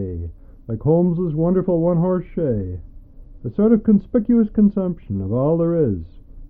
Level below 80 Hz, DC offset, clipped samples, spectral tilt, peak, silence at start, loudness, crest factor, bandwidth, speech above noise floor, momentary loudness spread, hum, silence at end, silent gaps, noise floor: -40 dBFS; under 0.1%; under 0.1%; -14.5 dB/octave; -4 dBFS; 0 s; -19 LUFS; 14 dB; 3.2 kHz; 22 dB; 14 LU; none; 0.05 s; none; -40 dBFS